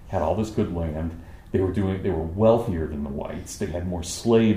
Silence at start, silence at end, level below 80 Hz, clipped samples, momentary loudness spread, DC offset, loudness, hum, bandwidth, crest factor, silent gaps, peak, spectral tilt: 0 s; 0 s; -40 dBFS; under 0.1%; 12 LU; under 0.1%; -25 LUFS; none; 15.5 kHz; 18 dB; none; -6 dBFS; -6.5 dB/octave